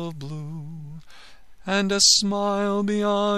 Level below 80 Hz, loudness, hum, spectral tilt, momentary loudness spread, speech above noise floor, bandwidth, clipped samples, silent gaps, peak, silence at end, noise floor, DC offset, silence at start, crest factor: -54 dBFS; -20 LUFS; none; -3 dB/octave; 23 LU; 27 dB; 14 kHz; under 0.1%; none; -2 dBFS; 0 s; -49 dBFS; 0.7%; 0 s; 22 dB